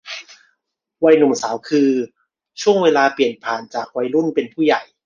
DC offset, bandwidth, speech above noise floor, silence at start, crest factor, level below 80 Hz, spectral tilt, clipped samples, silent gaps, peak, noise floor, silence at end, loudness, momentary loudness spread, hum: under 0.1%; 7.6 kHz; 56 dB; 0.05 s; 16 dB; -66 dBFS; -4.5 dB/octave; under 0.1%; none; -2 dBFS; -73 dBFS; 0.25 s; -17 LUFS; 11 LU; none